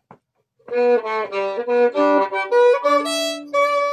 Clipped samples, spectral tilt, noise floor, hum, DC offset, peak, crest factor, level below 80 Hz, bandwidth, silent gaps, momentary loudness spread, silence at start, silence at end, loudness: under 0.1%; -2 dB/octave; -64 dBFS; none; under 0.1%; -4 dBFS; 14 dB; -78 dBFS; 13 kHz; none; 8 LU; 0.7 s; 0 s; -18 LUFS